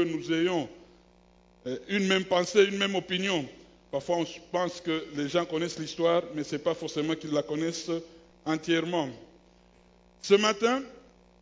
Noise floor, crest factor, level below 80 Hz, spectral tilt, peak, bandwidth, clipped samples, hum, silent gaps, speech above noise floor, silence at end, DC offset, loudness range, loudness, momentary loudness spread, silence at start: -60 dBFS; 22 dB; -66 dBFS; -4.5 dB/octave; -8 dBFS; 7.8 kHz; under 0.1%; none; none; 31 dB; 0.45 s; under 0.1%; 3 LU; -29 LUFS; 13 LU; 0 s